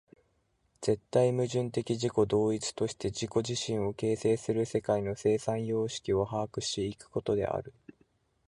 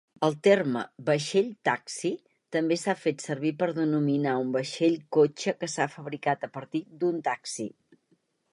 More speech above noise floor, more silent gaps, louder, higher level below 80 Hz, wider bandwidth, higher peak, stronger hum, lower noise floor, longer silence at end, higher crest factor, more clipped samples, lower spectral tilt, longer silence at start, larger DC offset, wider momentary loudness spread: about the same, 43 dB vs 43 dB; neither; second, -31 LUFS vs -28 LUFS; first, -58 dBFS vs -78 dBFS; about the same, 11.5 kHz vs 11.5 kHz; second, -14 dBFS vs -8 dBFS; neither; about the same, -73 dBFS vs -70 dBFS; about the same, 0.8 s vs 0.85 s; about the same, 18 dB vs 20 dB; neither; about the same, -5.5 dB/octave vs -5 dB/octave; first, 0.8 s vs 0.2 s; neither; about the same, 7 LU vs 9 LU